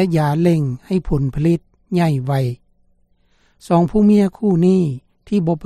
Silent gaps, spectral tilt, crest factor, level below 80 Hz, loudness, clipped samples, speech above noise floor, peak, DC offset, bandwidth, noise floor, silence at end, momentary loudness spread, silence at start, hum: none; -8.5 dB/octave; 14 dB; -38 dBFS; -17 LUFS; under 0.1%; 42 dB; -4 dBFS; under 0.1%; 13 kHz; -58 dBFS; 0 s; 9 LU; 0 s; none